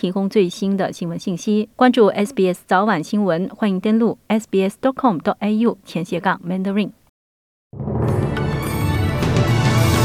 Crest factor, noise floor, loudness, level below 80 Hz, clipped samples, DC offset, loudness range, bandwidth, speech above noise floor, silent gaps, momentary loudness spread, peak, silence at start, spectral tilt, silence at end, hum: 16 dB; under -90 dBFS; -19 LUFS; -40 dBFS; under 0.1%; under 0.1%; 4 LU; 15.5 kHz; over 72 dB; 7.09-7.70 s; 7 LU; -2 dBFS; 0.05 s; -6.5 dB/octave; 0 s; none